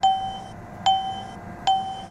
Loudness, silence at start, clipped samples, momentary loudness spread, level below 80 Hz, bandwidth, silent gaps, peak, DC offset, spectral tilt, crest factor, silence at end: -25 LUFS; 0 s; under 0.1%; 14 LU; -52 dBFS; 10.5 kHz; none; -8 dBFS; under 0.1%; -3 dB/octave; 16 dB; 0 s